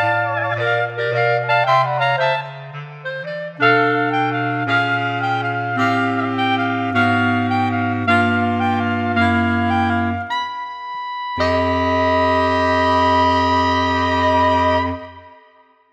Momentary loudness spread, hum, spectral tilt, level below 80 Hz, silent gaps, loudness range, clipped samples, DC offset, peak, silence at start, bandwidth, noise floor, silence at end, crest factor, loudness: 11 LU; none; -6.5 dB/octave; -44 dBFS; none; 3 LU; under 0.1%; under 0.1%; -2 dBFS; 0 s; 9 kHz; -52 dBFS; 0.6 s; 16 dB; -18 LUFS